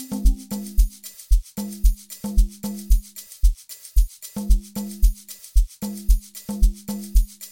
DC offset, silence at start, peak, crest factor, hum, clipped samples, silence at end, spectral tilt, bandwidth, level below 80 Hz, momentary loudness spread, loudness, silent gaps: 0.5%; 0 s; -6 dBFS; 16 dB; none; under 0.1%; 0.05 s; -5.5 dB/octave; 17 kHz; -20 dBFS; 8 LU; -26 LUFS; none